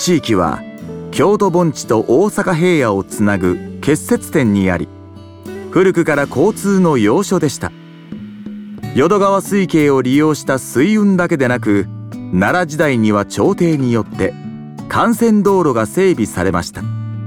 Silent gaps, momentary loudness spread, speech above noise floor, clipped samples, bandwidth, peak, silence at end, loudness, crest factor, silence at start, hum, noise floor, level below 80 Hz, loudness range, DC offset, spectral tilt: none; 16 LU; 21 dB; under 0.1%; 17.5 kHz; -2 dBFS; 0 s; -14 LUFS; 12 dB; 0 s; none; -35 dBFS; -46 dBFS; 2 LU; under 0.1%; -6 dB/octave